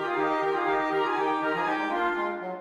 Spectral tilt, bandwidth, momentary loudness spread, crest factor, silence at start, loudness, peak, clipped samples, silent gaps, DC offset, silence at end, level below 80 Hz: -5.5 dB/octave; 11.5 kHz; 2 LU; 12 dB; 0 s; -27 LUFS; -14 dBFS; under 0.1%; none; under 0.1%; 0 s; -64 dBFS